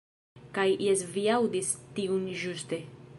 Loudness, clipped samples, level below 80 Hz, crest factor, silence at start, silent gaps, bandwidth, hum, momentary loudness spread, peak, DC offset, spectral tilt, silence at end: -30 LUFS; under 0.1%; -70 dBFS; 18 dB; 0.35 s; none; 11.5 kHz; none; 10 LU; -12 dBFS; under 0.1%; -4 dB/octave; 0 s